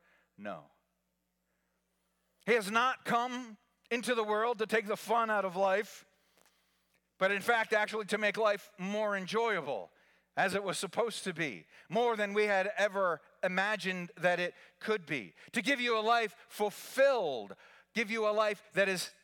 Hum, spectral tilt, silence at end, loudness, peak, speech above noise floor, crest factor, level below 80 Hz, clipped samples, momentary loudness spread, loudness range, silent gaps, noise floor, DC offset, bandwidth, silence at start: none; -3.5 dB/octave; 0.15 s; -32 LUFS; -16 dBFS; 49 dB; 18 dB; -88 dBFS; under 0.1%; 10 LU; 3 LU; none; -81 dBFS; under 0.1%; 19 kHz; 0.4 s